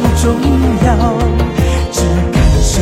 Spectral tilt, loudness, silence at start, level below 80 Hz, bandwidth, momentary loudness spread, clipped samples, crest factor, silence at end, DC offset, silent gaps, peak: -6 dB/octave; -12 LUFS; 0 s; -14 dBFS; 15 kHz; 3 LU; under 0.1%; 10 dB; 0 s; under 0.1%; none; 0 dBFS